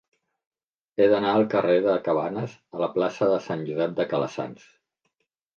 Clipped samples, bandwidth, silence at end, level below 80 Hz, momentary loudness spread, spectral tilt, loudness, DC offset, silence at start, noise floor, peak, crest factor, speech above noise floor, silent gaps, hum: under 0.1%; 7 kHz; 1 s; -70 dBFS; 12 LU; -7 dB/octave; -24 LUFS; under 0.1%; 1 s; -78 dBFS; -8 dBFS; 18 dB; 54 dB; none; none